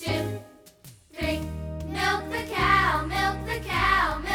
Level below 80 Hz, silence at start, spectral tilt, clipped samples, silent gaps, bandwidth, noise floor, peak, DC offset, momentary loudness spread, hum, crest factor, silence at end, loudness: -38 dBFS; 0 s; -4.5 dB/octave; under 0.1%; none; over 20 kHz; -51 dBFS; -8 dBFS; under 0.1%; 13 LU; none; 18 dB; 0 s; -25 LUFS